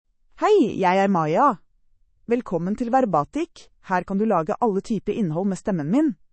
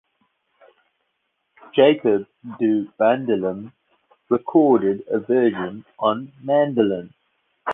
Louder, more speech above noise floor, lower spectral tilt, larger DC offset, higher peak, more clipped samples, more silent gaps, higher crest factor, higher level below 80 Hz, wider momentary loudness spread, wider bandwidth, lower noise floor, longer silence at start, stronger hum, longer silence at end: about the same, -22 LUFS vs -20 LUFS; second, 38 dB vs 54 dB; second, -7 dB/octave vs -9 dB/octave; neither; second, -8 dBFS vs -2 dBFS; neither; neither; about the same, 16 dB vs 18 dB; first, -54 dBFS vs -64 dBFS; second, 8 LU vs 13 LU; first, 8.8 kHz vs 3.9 kHz; second, -60 dBFS vs -73 dBFS; second, 0.4 s vs 1.75 s; neither; first, 0.2 s vs 0 s